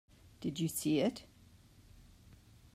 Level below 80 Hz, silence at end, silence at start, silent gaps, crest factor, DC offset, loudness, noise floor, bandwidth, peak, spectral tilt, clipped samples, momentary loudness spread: -66 dBFS; 0.4 s; 0.4 s; none; 18 dB; under 0.1%; -36 LUFS; -62 dBFS; 16 kHz; -22 dBFS; -5 dB/octave; under 0.1%; 11 LU